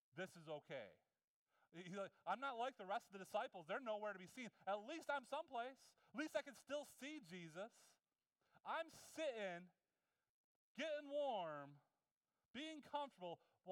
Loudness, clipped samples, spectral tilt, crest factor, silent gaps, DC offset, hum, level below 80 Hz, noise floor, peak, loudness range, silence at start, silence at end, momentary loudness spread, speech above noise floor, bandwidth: -51 LUFS; under 0.1%; -4 dB/octave; 20 dB; 1.24-1.46 s, 10.29-10.75 s, 12.11-12.21 s, 12.50-12.54 s; under 0.1%; none; under -90 dBFS; under -90 dBFS; -32 dBFS; 4 LU; 0.15 s; 0 s; 11 LU; over 40 dB; 17 kHz